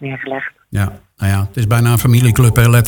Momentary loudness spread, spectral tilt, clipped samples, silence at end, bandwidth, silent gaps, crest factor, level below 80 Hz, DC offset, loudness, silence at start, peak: 12 LU; -6 dB/octave; under 0.1%; 0 s; 19 kHz; none; 12 dB; -34 dBFS; under 0.1%; -14 LUFS; 0 s; 0 dBFS